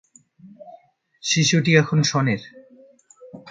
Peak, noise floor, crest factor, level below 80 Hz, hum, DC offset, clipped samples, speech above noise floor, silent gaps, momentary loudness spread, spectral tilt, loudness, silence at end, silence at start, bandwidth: -2 dBFS; -52 dBFS; 22 dB; -62 dBFS; none; under 0.1%; under 0.1%; 33 dB; none; 10 LU; -4.5 dB/octave; -19 LUFS; 0 s; 0.45 s; 9.2 kHz